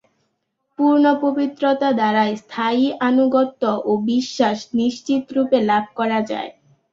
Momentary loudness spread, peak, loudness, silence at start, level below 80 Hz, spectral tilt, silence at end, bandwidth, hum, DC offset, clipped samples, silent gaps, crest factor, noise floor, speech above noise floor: 6 LU; -4 dBFS; -19 LUFS; 0.8 s; -64 dBFS; -5.5 dB/octave; 0.4 s; 7.6 kHz; none; under 0.1%; under 0.1%; none; 16 dB; -72 dBFS; 54 dB